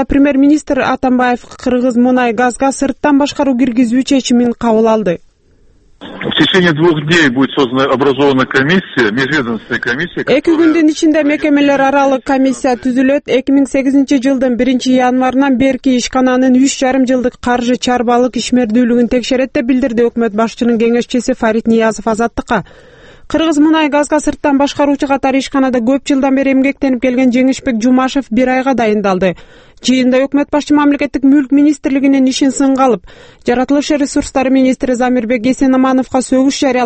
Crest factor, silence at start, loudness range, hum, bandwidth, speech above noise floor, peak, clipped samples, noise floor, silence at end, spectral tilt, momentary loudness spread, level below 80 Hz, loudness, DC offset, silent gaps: 12 dB; 0 s; 2 LU; none; 8.8 kHz; 36 dB; 0 dBFS; under 0.1%; -47 dBFS; 0 s; -5 dB/octave; 5 LU; -40 dBFS; -12 LUFS; under 0.1%; none